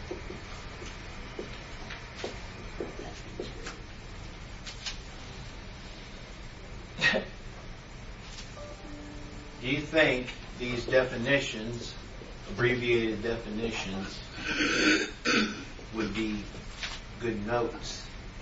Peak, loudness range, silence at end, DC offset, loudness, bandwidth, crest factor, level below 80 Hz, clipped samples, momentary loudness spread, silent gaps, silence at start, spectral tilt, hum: -10 dBFS; 12 LU; 0 s; under 0.1%; -31 LUFS; 8 kHz; 24 dB; -46 dBFS; under 0.1%; 18 LU; none; 0 s; -4 dB/octave; none